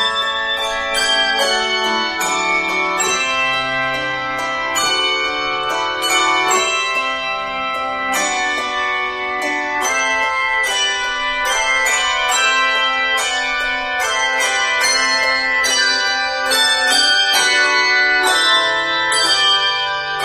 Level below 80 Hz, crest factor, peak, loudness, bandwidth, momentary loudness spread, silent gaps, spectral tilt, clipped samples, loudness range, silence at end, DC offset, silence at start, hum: -48 dBFS; 14 dB; -2 dBFS; -15 LUFS; 15.5 kHz; 7 LU; none; 0.5 dB/octave; under 0.1%; 4 LU; 0 s; under 0.1%; 0 s; none